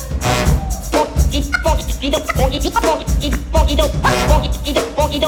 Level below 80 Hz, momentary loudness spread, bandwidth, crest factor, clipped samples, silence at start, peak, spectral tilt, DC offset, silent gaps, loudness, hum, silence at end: -20 dBFS; 4 LU; 18 kHz; 14 dB; under 0.1%; 0 s; -2 dBFS; -4.5 dB/octave; under 0.1%; none; -17 LUFS; none; 0 s